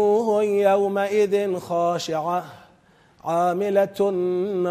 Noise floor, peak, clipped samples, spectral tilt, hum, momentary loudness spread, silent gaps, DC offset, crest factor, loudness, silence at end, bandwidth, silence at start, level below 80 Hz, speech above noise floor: -56 dBFS; -6 dBFS; under 0.1%; -6 dB/octave; none; 7 LU; none; under 0.1%; 16 dB; -22 LUFS; 0 s; 15 kHz; 0 s; -70 dBFS; 34 dB